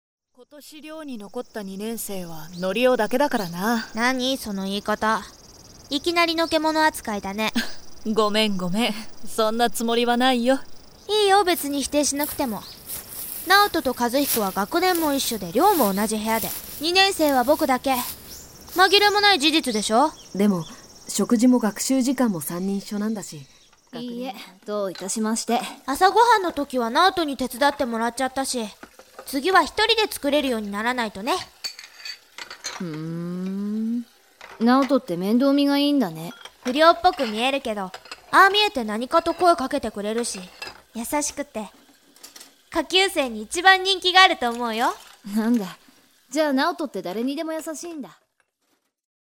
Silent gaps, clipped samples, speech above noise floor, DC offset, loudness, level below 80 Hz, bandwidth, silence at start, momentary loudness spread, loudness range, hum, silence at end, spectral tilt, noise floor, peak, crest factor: none; under 0.1%; 49 dB; under 0.1%; -21 LUFS; -54 dBFS; over 20 kHz; 0.4 s; 17 LU; 7 LU; none; 1.25 s; -3 dB/octave; -71 dBFS; 0 dBFS; 22 dB